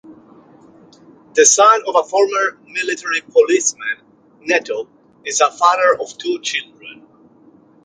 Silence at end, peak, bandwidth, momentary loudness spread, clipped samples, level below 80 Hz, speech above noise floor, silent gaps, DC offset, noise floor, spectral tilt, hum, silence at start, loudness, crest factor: 0.9 s; 0 dBFS; 10 kHz; 15 LU; under 0.1%; -70 dBFS; 33 dB; none; under 0.1%; -49 dBFS; 0 dB/octave; none; 0.1 s; -15 LUFS; 18 dB